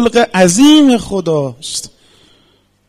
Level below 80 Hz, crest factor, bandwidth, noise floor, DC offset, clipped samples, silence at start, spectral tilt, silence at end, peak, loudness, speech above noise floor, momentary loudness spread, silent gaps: -44 dBFS; 12 dB; 15.5 kHz; -54 dBFS; under 0.1%; under 0.1%; 0 s; -4 dB/octave; 1 s; 0 dBFS; -11 LUFS; 43 dB; 15 LU; none